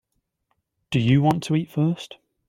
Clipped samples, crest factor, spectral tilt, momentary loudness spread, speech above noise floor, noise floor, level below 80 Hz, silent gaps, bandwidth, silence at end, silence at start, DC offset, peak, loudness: under 0.1%; 18 dB; -7 dB/octave; 12 LU; 53 dB; -74 dBFS; -56 dBFS; none; 14 kHz; 0.35 s; 0.9 s; under 0.1%; -6 dBFS; -22 LUFS